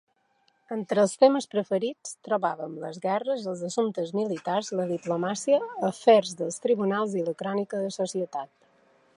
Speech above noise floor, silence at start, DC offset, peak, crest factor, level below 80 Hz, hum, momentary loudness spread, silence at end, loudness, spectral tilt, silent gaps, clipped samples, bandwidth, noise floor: 43 dB; 0.7 s; under 0.1%; -6 dBFS; 20 dB; -80 dBFS; none; 12 LU; 0.7 s; -27 LUFS; -5 dB/octave; none; under 0.1%; 11.5 kHz; -69 dBFS